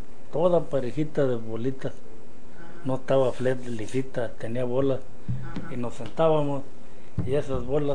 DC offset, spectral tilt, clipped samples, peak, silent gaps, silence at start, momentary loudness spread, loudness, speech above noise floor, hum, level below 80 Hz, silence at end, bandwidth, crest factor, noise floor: 6%; -7.5 dB/octave; under 0.1%; -8 dBFS; none; 0 s; 13 LU; -28 LUFS; 19 dB; none; -48 dBFS; 0 s; 10 kHz; 18 dB; -46 dBFS